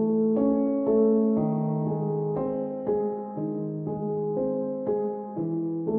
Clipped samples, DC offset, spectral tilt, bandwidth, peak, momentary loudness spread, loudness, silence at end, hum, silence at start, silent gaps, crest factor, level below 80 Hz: under 0.1%; under 0.1%; -14.5 dB/octave; 2.4 kHz; -12 dBFS; 9 LU; -27 LUFS; 0 s; none; 0 s; none; 14 dB; -62 dBFS